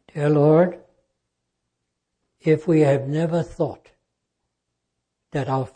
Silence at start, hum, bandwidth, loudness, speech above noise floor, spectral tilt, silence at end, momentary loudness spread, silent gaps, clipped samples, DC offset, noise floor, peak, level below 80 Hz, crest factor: 0.15 s; 60 Hz at -55 dBFS; 9.2 kHz; -21 LUFS; 59 dB; -8.5 dB/octave; 0.1 s; 11 LU; none; under 0.1%; under 0.1%; -79 dBFS; -6 dBFS; -58 dBFS; 18 dB